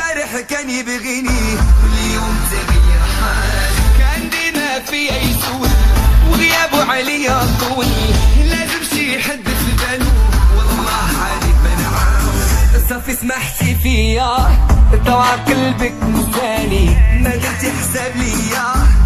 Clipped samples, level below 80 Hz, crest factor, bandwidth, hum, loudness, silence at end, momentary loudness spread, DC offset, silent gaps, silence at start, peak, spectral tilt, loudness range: under 0.1%; -14 dBFS; 12 dB; 15.5 kHz; none; -15 LUFS; 0 s; 5 LU; under 0.1%; none; 0 s; -2 dBFS; -4.5 dB/octave; 2 LU